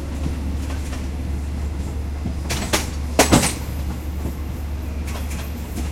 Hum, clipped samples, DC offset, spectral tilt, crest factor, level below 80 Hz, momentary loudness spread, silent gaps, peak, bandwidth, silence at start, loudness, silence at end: none; under 0.1%; under 0.1%; -4.5 dB/octave; 22 dB; -28 dBFS; 12 LU; none; 0 dBFS; 16.5 kHz; 0 s; -24 LUFS; 0 s